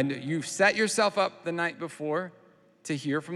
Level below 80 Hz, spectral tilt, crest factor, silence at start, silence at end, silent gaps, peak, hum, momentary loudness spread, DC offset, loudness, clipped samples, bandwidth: -86 dBFS; -4 dB/octave; 20 dB; 0 s; 0 s; none; -10 dBFS; none; 12 LU; under 0.1%; -28 LUFS; under 0.1%; 13.5 kHz